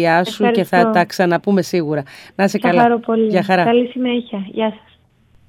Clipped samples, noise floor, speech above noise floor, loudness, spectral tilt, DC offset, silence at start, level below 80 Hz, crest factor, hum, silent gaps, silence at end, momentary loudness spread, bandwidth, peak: under 0.1%; -52 dBFS; 37 dB; -16 LUFS; -6 dB/octave; under 0.1%; 0 s; -60 dBFS; 16 dB; none; none; 0.7 s; 9 LU; 16 kHz; 0 dBFS